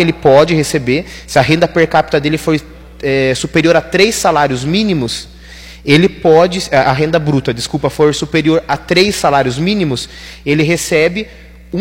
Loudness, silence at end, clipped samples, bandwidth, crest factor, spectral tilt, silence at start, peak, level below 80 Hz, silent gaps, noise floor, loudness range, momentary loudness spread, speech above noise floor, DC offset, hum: -12 LUFS; 0 s; under 0.1%; 17 kHz; 12 dB; -5 dB/octave; 0 s; 0 dBFS; -36 dBFS; none; -34 dBFS; 1 LU; 10 LU; 22 dB; under 0.1%; none